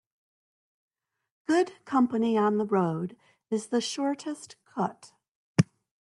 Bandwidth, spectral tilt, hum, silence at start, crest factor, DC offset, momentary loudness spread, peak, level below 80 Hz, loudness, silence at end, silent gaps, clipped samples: 11.5 kHz; -6 dB/octave; none; 1.5 s; 22 dB; under 0.1%; 13 LU; -8 dBFS; -68 dBFS; -28 LUFS; 0.35 s; 5.29-5.55 s; under 0.1%